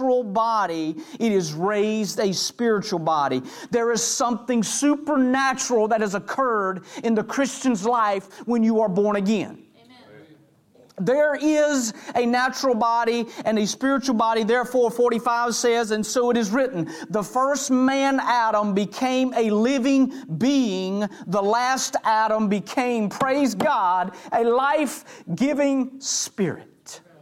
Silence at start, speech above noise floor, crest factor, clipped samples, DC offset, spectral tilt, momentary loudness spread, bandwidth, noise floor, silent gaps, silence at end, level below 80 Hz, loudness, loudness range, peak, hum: 0 s; 33 dB; 12 dB; under 0.1%; under 0.1%; -4 dB/octave; 6 LU; 16 kHz; -55 dBFS; none; 0.25 s; -66 dBFS; -22 LUFS; 2 LU; -10 dBFS; none